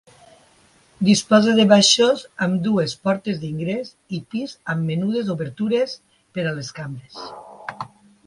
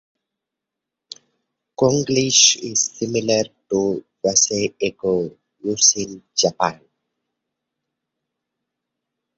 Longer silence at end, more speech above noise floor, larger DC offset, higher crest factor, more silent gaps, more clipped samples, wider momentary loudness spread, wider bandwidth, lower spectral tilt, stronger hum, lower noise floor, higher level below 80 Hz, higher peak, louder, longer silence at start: second, 0.4 s vs 2.6 s; second, 36 dB vs 65 dB; neither; about the same, 20 dB vs 22 dB; neither; neither; first, 21 LU vs 11 LU; first, 11.5 kHz vs 8 kHz; first, -4.5 dB/octave vs -2.5 dB/octave; neither; second, -55 dBFS vs -84 dBFS; about the same, -62 dBFS vs -58 dBFS; about the same, -2 dBFS vs 0 dBFS; about the same, -20 LUFS vs -18 LUFS; second, 1 s vs 1.8 s